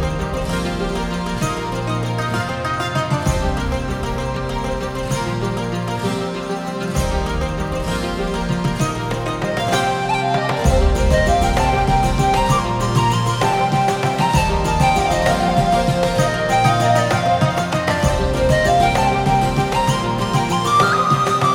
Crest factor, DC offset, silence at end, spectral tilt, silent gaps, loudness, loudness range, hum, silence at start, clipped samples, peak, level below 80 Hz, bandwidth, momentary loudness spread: 16 dB; under 0.1%; 0 s; -5.5 dB/octave; none; -18 LUFS; 6 LU; none; 0 s; under 0.1%; -2 dBFS; -26 dBFS; 17 kHz; 7 LU